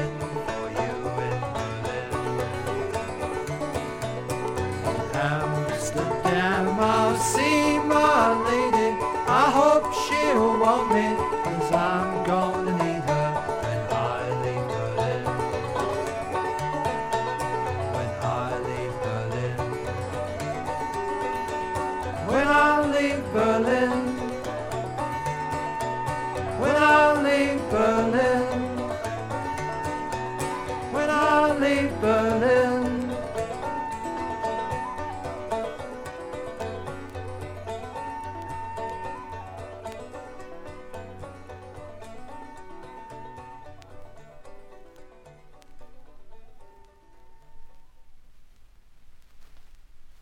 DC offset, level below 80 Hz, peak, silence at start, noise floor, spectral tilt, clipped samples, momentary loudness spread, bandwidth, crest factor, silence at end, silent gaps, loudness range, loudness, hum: under 0.1%; -48 dBFS; -6 dBFS; 0 s; -50 dBFS; -5.5 dB/octave; under 0.1%; 17 LU; 17 kHz; 20 dB; 0.05 s; none; 16 LU; -25 LUFS; none